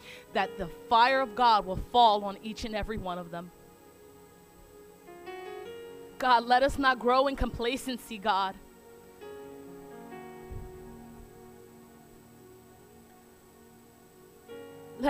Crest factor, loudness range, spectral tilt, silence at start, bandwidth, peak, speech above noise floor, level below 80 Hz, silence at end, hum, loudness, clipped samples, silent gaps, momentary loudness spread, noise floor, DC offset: 20 dB; 21 LU; -4.5 dB/octave; 0.05 s; 15.5 kHz; -10 dBFS; 29 dB; -50 dBFS; 0 s; none; -27 LUFS; under 0.1%; none; 24 LU; -56 dBFS; under 0.1%